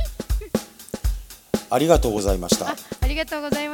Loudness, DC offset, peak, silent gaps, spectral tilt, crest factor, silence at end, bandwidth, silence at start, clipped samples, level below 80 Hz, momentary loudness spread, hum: -23 LUFS; under 0.1%; -2 dBFS; none; -4.5 dB/octave; 22 dB; 0 s; 18 kHz; 0 s; under 0.1%; -28 dBFS; 11 LU; none